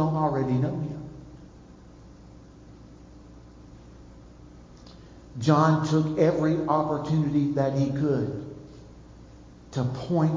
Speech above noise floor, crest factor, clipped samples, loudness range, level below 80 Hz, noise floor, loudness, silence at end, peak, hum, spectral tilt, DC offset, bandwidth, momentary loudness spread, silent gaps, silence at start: 25 dB; 22 dB; under 0.1%; 13 LU; -52 dBFS; -48 dBFS; -25 LUFS; 0 s; -6 dBFS; 60 Hz at -50 dBFS; -8 dB/octave; under 0.1%; 7.6 kHz; 22 LU; none; 0 s